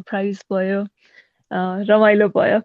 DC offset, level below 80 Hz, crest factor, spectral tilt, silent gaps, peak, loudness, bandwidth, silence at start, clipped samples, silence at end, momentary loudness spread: under 0.1%; -70 dBFS; 16 dB; -7.5 dB/octave; none; -2 dBFS; -18 LUFS; 7.2 kHz; 0.1 s; under 0.1%; 0.05 s; 12 LU